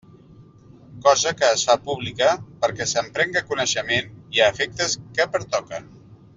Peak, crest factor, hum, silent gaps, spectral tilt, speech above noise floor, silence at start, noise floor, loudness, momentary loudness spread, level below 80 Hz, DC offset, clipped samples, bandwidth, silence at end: -2 dBFS; 20 dB; none; none; -2 dB/octave; 27 dB; 0.4 s; -48 dBFS; -21 LUFS; 8 LU; -58 dBFS; under 0.1%; under 0.1%; 7.8 kHz; 0.2 s